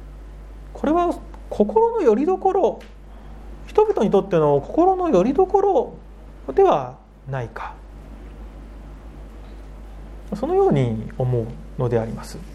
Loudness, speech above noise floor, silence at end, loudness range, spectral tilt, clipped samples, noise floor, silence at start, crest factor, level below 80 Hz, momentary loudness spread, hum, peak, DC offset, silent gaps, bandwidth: -20 LUFS; 20 dB; 0 s; 10 LU; -8.5 dB/octave; under 0.1%; -39 dBFS; 0 s; 18 dB; -40 dBFS; 23 LU; 50 Hz at -40 dBFS; -2 dBFS; under 0.1%; none; 11.5 kHz